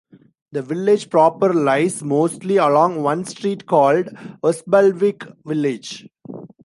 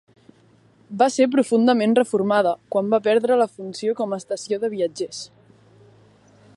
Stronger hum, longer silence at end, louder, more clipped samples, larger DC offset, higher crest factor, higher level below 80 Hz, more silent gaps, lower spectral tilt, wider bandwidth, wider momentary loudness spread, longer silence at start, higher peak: neither; second, 0.2 s vs 1.3 s; first, -18 LUFS vs -21 LUFS; neither; neither; about the same, 16 dB vs 18 dB; about the same, -70 dBFS vs -72 dBFS; neither; about the same, -6 dB/octave vs -5 dB/octave; about the same, 11.5 kHz vs 11.5 kHz; first, 15 LU vs 12 LU; second, 0.55 s vs 0.9 s; about the same, -2 dBFS vs -4 dBFS